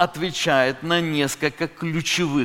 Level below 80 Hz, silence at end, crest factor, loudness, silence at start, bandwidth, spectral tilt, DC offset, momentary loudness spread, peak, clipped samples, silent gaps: -54 dBFS; 0 s; 20 dB; -22 LUFS; 0 s; 17 kHz; -4 dB/octave; under 0.1%; 6 LU; -2 dBFS; under 0.1%; none